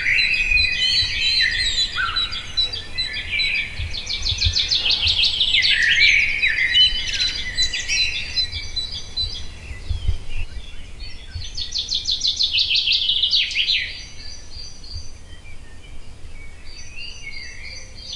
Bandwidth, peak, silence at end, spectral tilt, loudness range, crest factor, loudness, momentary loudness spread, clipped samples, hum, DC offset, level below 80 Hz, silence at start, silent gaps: 11.5 kHz; -2 dBFS; 0 s; -0.5 dB/octave; 14 LU; 20 dB; -18 LUFS; 21 LU; under 0.1%; none; under 0.1%; -34 dBFS; 0 s; none